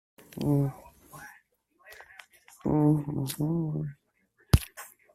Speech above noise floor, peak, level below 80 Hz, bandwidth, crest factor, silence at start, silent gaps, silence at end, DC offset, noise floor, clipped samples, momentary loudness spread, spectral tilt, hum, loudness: 41 dB; -4 dBFS; -44 dBFS; 15 kHz; 26 dB; 0.35 s; none; 0.3 s; under 0.1%; -69 dBFS; under 0.1%; 24 LU; -7 dB/octave; none; -29 LUFS